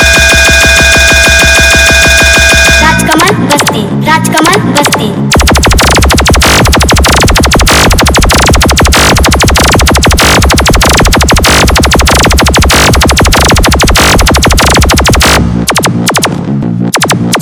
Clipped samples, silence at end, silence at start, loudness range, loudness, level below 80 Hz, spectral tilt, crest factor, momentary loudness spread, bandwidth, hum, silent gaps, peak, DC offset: 10%; 0 s; 0 s; 3 LU; -4 LUFS; -12 dBFS; -3 dB/octave; 4 dB; 6 LU; over 20 kHz; none; none; 0 dBFS; 0.5%